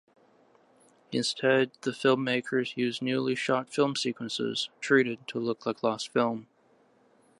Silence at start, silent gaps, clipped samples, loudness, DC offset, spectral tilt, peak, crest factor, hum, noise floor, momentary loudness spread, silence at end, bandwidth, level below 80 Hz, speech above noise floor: 1.1 s; none; under 0.1%; -28 LUFS; under 0.1%; -4.5 dB/octave; -8 dBFS; 20 dB; none; -64 dBFS; 7 LU; 0.95 s; 11.5 kHz; -78 dBFS; 36 dB